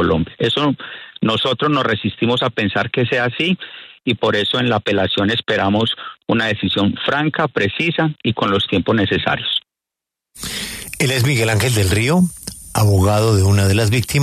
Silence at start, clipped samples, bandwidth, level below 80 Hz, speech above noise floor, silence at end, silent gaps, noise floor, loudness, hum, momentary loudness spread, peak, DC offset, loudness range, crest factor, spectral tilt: 0 s; under 0.1%; 14 kHz; -46 dBFS; 69 dB; 0 s; none; -85 dBFS; -17 LUFS; none; 9 LU; -4 dBFS; under 0.1%; 3 LU; 14 dB; -5 dB/octave